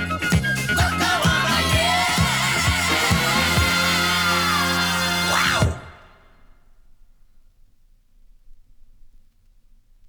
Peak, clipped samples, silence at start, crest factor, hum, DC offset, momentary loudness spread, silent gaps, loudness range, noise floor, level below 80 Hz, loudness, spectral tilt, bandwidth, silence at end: -4 dBFS; under 0.1%; 0 s; 18 dB; none; under 0.1%; 3 LU; none; 7 LU; -54 dBFS; -36 dBFS; -19 LUFS; -3 dB/octave; over 20 kHz; 1 s